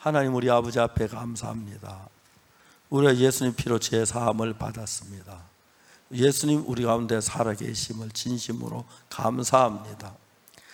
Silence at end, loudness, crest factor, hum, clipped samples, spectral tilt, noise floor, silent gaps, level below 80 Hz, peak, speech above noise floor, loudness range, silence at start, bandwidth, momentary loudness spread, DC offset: 0.6 s; -26 LUFS; 22 dB; none; under 0.1%; -5 dB/octave; -59 dBFS; none; -52 dBFS; -4 dBFS; 33 dB; 2 LU; 0 s; 18.5 kHz; 18 LU; under 0.1%